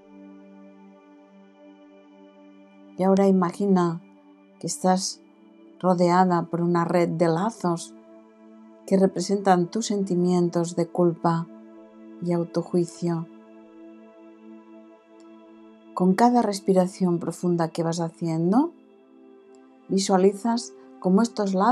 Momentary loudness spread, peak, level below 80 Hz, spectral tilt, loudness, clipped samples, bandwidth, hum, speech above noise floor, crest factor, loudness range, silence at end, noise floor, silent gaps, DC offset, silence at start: 11 LU; -4 dBFS; -80 dBFS; -6.5 dB/octave; -23 LUFS; under 0.1%; 12 kHz; none; 31 dB; 20 dB; 7 LU; 0 s; -53 dBFS; none; under 0.1%; 0.15 s